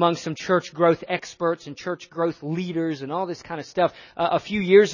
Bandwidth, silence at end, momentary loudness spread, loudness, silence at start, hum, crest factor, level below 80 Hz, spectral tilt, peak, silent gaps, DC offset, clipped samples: 7.4 kHz; 0 s; 10 LU; -24 LUFS; 0 s; none; 18 dB; -62 dBFS; -6 dB/octave; -4 dBFS; none; under 0.1%; under 0.1%